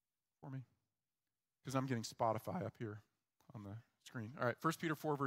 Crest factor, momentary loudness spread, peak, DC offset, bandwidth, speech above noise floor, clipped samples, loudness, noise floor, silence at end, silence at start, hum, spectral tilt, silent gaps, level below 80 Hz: 22 dB; 16 LU; -22 dBFS; under 0.1%; 16 kHz; over 48 dB; under 0.1%; -43 LUFS; under -90 dBFS; 0 s; 0.4 s; none; -6 dB/octave; none; -84 dBFS